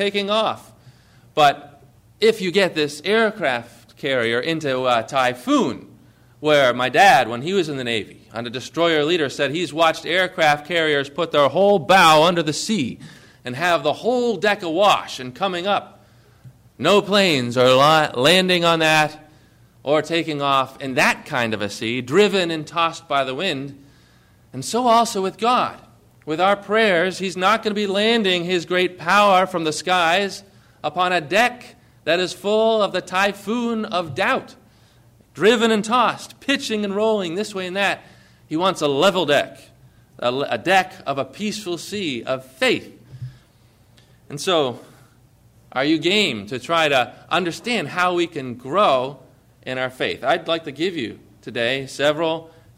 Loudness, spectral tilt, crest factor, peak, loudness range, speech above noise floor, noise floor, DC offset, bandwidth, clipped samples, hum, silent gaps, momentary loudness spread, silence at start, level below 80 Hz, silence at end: -19 LUFS; -4 dB/octave; 16 dB; -4 dBFS; 6 LU; 35 dB; -54 dBFS; under 0.1%; 16 kHz; under 0.1%; none; none; 12 LU; 0 s; -60 dBFS; 0.3 s